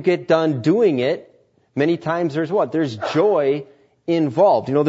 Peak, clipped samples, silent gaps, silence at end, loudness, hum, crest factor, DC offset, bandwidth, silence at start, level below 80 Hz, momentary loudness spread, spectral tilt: -4 dBFS; under 0.1%; none; 0 s; -19 LUFS; none; 16 dB; under 0.1%; 8 kHz; 0 s; -66 dBFS; 7 LU; -7.5 dB/octave